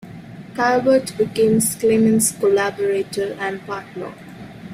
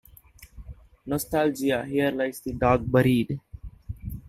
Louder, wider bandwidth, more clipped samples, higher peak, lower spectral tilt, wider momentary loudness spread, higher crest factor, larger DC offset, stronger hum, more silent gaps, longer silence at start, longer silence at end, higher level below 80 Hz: first, -18 LUFS vs -25 LUFS; about the same, 16 kHz vs 16 kHz; neither; about the same, -6 dBFS vs -6 dBFS; second, -4.5 dB/octave vs -6.5 dB/octave; about the same, 21 LU vs 23 LU; second, 14 dB vs 20 dB; neither; neither; neither; second, 0.05 s vs 0.4 s; about the same, 0 s vs 0.1 s; second, -56 dBFS vs -44 dBFS